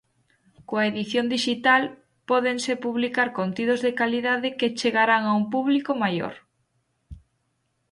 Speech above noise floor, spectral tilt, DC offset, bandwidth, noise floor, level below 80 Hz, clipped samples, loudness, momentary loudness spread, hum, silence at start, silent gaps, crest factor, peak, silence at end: 50 dB; -4.5 dB/octave; under 0.1%; 11.5 kHz; -73 dBFS; -60 dBFS; under 0.1%; -23 LUFS; 6 LU; none; 0.7 s; none; 20 dB; -6 dBFS; 0.75 s